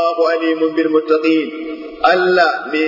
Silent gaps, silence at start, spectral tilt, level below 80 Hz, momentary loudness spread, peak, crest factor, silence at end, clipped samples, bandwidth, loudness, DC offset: none; 0 s; -5.5 dB/octave; -56 dBFS; 9 LU; 0 dBFS; 14 dB; 0 s; under 0.1%; 5.8 kHz; -15 LUFS; under 0.1%